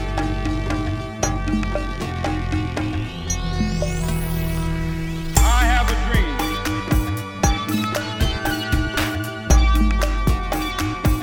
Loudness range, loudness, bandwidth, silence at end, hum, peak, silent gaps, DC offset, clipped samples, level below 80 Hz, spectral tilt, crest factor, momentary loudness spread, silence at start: 4 LU; -22 LUFS; over 20 kHz; 0 s; none; -2 dBFS; none; under 0.1%; under 0.1%; -22 dBFS; -5 dB/octave; 18 dB; 7 LU; 0 s